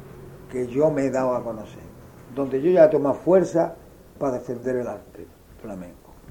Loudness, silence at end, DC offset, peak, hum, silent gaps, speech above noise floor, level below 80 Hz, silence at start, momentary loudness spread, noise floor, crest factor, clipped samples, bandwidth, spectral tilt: -22 LUFS; 0.15 s; under 0.1%; -2 dBFS; none; none; 20 dB; -54 dBFS; 0 s; 25 LU; -42 dBFS; 22 dB; under 0.1%; 18.5 kHz; -7.5 dB/octave